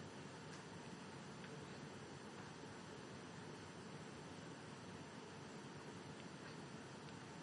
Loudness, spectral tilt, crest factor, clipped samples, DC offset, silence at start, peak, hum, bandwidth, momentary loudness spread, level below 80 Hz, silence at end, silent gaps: -54 LUFS; -4.5 dB/octave; 14 dB; under 0.1%; under 0.1%; 0 s; -40 dBFS; none; 11.5 kHz; 1 LU; -82 dBFS; 0 s; none